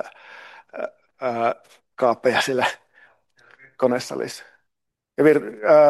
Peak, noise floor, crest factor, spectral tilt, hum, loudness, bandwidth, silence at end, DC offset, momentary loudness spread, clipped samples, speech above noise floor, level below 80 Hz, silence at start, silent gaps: -4 dBFS; -81 dBFS; 18 dB; -4.5 dB/octave; none; -22 LUFS; 12.5 kHz; 0 s; under 0.1%; 21 LU; under 0.1%; 63 dB; -74 dBFS; 0.05 s; none